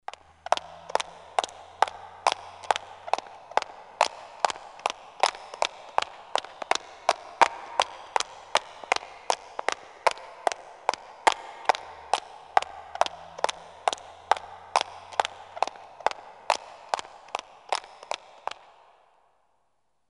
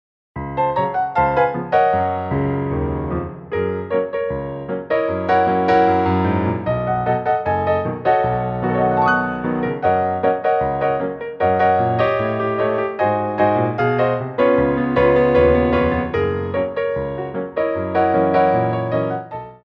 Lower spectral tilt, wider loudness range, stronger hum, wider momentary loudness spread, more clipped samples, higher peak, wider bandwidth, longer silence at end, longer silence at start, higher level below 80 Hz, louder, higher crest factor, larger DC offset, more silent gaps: second, 0 dB/octave vs -9 dB/octave; about the same, 5 LU vs 3 LU; neither; about the same, 8 LU vs 8 LU; neither; about the same, -2 dBFS vs -2 dBFS; first, 11.5 kHz vs 6.2 kHz; first, 1.95 s vs 0.1 s; first, 0.5 s vs 0.35 s; second, -70 dBFS vs -40 dBFS; second, -30 LUFS vs -19 LUFS; first, 28 dB vs 16 dB; neither; neither